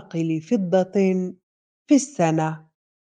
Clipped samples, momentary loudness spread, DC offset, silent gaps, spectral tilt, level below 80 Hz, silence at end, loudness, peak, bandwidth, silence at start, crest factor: under 0.1%; 8 LU; under 0.1%; 1.43-1.85 s; -6.5 dB/octave; -70 dBFS; 0.45 s; -22 LUFS; -6 dBFS; 9.8 kHz; 0.15 s; 18 dB